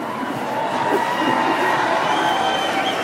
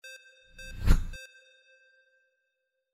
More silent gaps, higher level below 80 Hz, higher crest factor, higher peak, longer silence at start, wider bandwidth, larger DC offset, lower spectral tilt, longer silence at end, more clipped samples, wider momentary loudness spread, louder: neither; second, -60 dBFS vs -34 dBFS; second, 14 dB vs 22 dB; first, -6 dBFS vs -10 dBFS; about the same, 0 s vs 0.05 s; first, 16 kHz vs 14.5 kHz; neither; second, -3.5 dB/octave vs -5.5 dB/octave; second, 0 s vs 1.65 s; neither; second, 5 LU vs 21 LU; first, -19 LUFS vs -32 LUFS